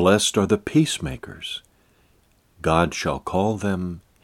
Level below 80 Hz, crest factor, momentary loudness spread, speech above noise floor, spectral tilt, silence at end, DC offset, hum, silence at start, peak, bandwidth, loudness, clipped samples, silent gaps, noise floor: -46 dBFS; 20 dB; 13 LU; 39 dB; -4.5 dB/octave; 0.25 s; under 0.1%; none; 0 s; -2 dBFS; 16.5 kHz; -23 LUFS; under 0.1%; none; -60 dBFS